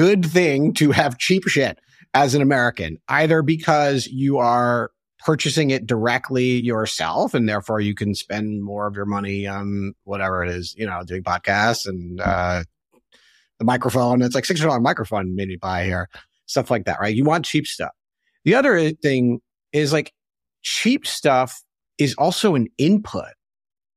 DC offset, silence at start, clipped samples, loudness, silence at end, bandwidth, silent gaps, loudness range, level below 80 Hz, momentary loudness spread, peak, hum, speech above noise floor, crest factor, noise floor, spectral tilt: under 0.1%; 0 s; under 0.1%; -20 LUFS; 0.65 s; 15.5 kHz; none; 5 LU; -50 dBFS; 10 LU; -2 dBFS; none; 39 dB; 20 dB; -59 dBFS; -5 dB/octave